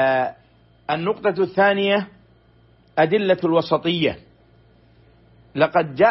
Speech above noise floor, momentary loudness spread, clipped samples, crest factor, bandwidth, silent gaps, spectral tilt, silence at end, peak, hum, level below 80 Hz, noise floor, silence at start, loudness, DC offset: 36 dB; 11 LU; under 0.1%; 16 dB; 5.8 kHz; none; -9.5 dB/octave; 0 s; -4 dBFS; none; -58 dBFS; -54 dBFS; 0 s; -20 LUFS; under 0.1%